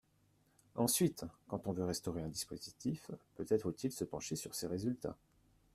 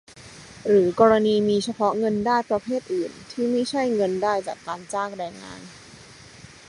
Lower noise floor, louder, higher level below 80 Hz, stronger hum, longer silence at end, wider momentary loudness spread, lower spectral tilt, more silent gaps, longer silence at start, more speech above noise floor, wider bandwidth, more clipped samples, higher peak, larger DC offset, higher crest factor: first, -74 dBFS vs -46 dBFS; second, -40 LUFS vs -23 LUFS; second, -68 dBFS vs -60 dBFS; neither; first, 0.6 s vs 0.2 s; second, 13 LU vs 19 LU; about the same, -5 dB/octave vs -5.5 dB/octave; neither; first, 0.75 s vs 0.15 s; first, 34 dB vs 24 dB; first, 15.5 kHz vs 11.5 kHz; neither; second, -20 dBFS vs -4 dBFS; neither; about the same, 20 dB vs 20 dB